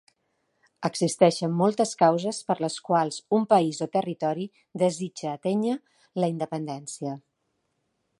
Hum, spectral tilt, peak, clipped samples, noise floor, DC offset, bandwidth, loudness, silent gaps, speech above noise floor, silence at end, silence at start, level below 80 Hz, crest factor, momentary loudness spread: none; -5.5 dB/octave; -4 dBFS; under 0.1%; -76 dBFS; under 0.1%; 11.5 kHz; -26 LUFS; none; 51 dB; 1 s; 0.8 s; -76 dBFS; 22 dB; 13 LU